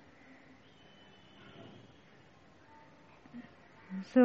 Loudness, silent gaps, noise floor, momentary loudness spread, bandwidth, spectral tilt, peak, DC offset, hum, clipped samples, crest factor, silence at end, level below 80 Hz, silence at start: -43 LUFS; none; -61 dBFS; 14 LU; 7 kHz; -6 dB/octave; -16 dBFS; under 0.1%; none; under 0.1%; 22 dB; 0 s; -78 dBFS; 3.35 s